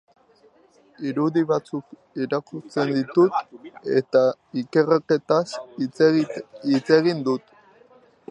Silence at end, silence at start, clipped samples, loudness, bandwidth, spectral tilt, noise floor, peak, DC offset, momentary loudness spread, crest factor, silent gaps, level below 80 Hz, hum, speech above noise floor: 0.9 s; 1 s; under 0.1%; -22 LUFS; 9.8 kHz; -7 dB/octave; -57 dBFS; -4 dBFS; under 0.1%; 12 LU; 20 dB; none; -74 dBFS; none; 35 dB